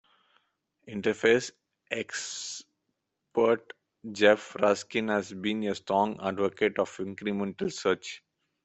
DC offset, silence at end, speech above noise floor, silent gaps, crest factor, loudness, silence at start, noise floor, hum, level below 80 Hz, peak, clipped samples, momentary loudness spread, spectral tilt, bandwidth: under 0.1%; 0.45 s; 53 dB; none; 22 dB; -29 LUFS; 0.85 s; -81 dBFS; none; -70 dBFS; -6 dBFS; under 0.1%; 14 LU; -4 dB/octave; 8.4 kHz